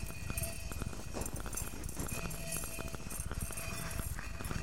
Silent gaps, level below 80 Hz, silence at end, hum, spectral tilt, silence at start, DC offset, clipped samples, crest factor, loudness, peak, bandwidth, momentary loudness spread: none; -46 dBFS; 0 s; none; -3.5 dB/octave; 0 s; 0.6%; under 0.1%; 20 dB; -41 LUFS; -22 dBFS; 16 kHz; 3 LU